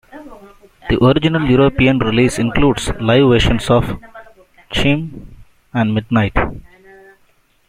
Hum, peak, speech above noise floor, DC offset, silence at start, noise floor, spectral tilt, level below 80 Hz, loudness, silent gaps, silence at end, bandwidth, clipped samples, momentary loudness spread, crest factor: none; -2 dBFS; 41 dB; under 0.1%; 0.15 s; -55 dBFS; -6 dB/octave; -30 dBFS; -15 LUFS; none; 1.1 s; 15 kHz; under 0.1%; 12 LU; 14 dB